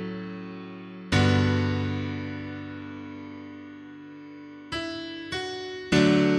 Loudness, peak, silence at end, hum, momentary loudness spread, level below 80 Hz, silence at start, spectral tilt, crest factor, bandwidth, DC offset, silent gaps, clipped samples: -27 LUFS; -8 dBFS; 0 s; none; 21 LU; -52 dBFS; 0 s; -6 dB/octave; 20 dB; 11 kHz; under 0.1%; none; under 0.1%